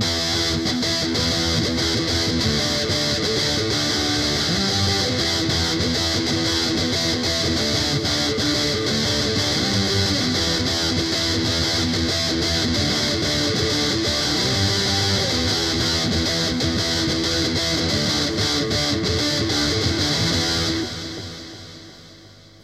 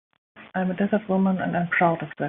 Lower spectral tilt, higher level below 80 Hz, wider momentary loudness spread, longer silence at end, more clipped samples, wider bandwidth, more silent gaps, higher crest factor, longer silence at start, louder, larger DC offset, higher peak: second, -3.5 dB/octave vs -6.5 dB/octave; first, -38 dBFS vs -64 dBFS; second, 1 LU vs 7 LU; first, 0.25 s vs 0 s; neither; first, 15 kHz vs 3.8 kHz; neither; about the same, 14 dB vs 16 dB; second, 0 s vs 0.35 s; first, -19 LUFS vs -24 LUFS; neither; about the same, -6 dBFS vs -8 dBFS